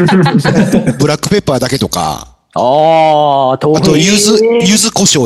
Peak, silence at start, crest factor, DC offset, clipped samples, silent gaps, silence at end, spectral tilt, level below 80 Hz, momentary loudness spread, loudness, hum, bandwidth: 0 dBFS; 0 s; 10 dB; under 0.1%; under 0.1%; none; 0 s; -4.5 dB/octave; -40 dBFS; 7 LU; -9 LUFS; none; 13 kHz